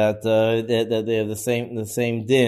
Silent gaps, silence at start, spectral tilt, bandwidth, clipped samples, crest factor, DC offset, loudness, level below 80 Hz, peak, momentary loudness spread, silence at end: none; 0 s; -5.5 dB/octave; 14 kHz; under 0.1%; 14 dB; under 0.1%; -22 LUFS; -60 dBFS; -6 dBFS; 5 LU; 0 s